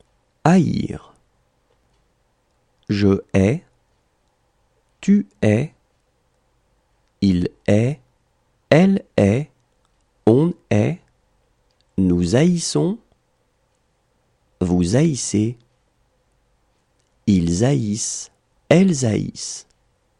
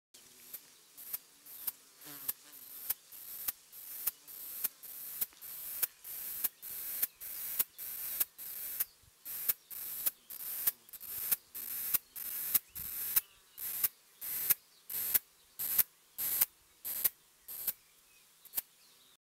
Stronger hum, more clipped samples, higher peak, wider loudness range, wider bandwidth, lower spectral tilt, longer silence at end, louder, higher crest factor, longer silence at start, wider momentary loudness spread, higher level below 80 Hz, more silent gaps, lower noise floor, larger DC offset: neither; neither; first, -2 dBFS vs -8 dBFS; about the same, 5 LU vs 7 LU; second, 11 kHz vs 16.5 kHz; first, -6.5 dB/octave vs 1 dB/octave; about the same, 0.6 s vs 0.6 s; first, -19 LUFS vs -35 LUFS; second, 20 dB vs 32 dB; first, 0.45 s vs 0.15 s; about the same, 14 LU vs 16 LU; first, -48 dBFS vs -74 dBFS; neither; about the same, -65 dBFS vs -64 dBFS; neither